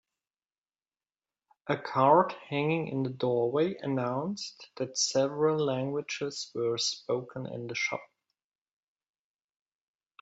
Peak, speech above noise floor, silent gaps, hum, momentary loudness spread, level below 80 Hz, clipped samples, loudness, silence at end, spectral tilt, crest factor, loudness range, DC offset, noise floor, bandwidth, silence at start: -10 dBFS; over 60 dB; none; none; 12 LU; -76 dBFS; under 0.1%; -30 LUFS; 2.15 s; -4.5 dB/octave; 22 dB; 6 LU; under 0.1%; under -90 dBFS; 8.2 kHz; 1.65 s